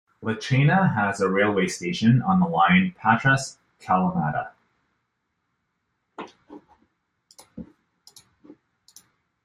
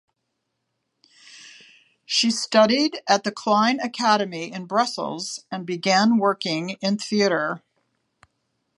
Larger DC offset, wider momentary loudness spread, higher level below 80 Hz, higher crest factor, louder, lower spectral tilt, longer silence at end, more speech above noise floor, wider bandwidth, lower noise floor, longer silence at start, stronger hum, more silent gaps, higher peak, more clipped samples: neither; first, 23 LU vs 12 LU; first, -58 dBFS vs -76 dBFS; about the same, 20 dB vs 20 dB; about the same, -22 LUFS vs -22 LUFS; first, -6 dB/octave vs -3.5 dB/octave; first, 1.8 s vs 1.2 s; about the same, 55 dB vs 56 dB; about the same, 11.5 kHz vs 11.5 kHz; about the same, -76 dBFS vs -77 dBFS; second, 0.2 s vs 1.3 s; neither; neither; about the same, -4 dBFS vs -2 dBFS; neither